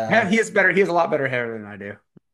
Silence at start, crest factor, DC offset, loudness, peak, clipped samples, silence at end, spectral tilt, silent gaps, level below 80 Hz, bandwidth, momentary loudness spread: 0 s; 18 dB; under 0.1%; -19 LUFS; -4 dBFS; under 0.1%; 0.4 s; -5 dB/octave; none; -66 dBFS; 12.5 kHz; 18 LU